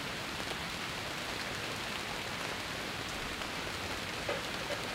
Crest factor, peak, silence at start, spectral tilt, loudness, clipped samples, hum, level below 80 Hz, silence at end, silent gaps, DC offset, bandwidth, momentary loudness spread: 18 dB; -22 dBFS; 0 s; -2.5 dB/octave; -37 LUFS; under 0.1%; none; -56 dBFS; 0 s; none; under 0.1%; 16.5 kHz; 1 LU